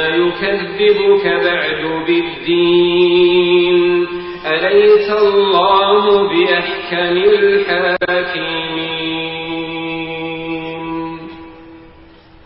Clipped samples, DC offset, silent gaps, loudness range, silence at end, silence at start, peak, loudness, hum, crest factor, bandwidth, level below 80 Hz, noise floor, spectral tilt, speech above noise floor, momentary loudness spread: under 0.1%; 0.2%; none; 9 LU; 0.65 s; 0 s; -2 dBFS; -14 LUFS; none; 12 dB; 5.8 kHz; -48 dBFS; -42 dBFS; -10 dB/octave; 29 dB; 12 LU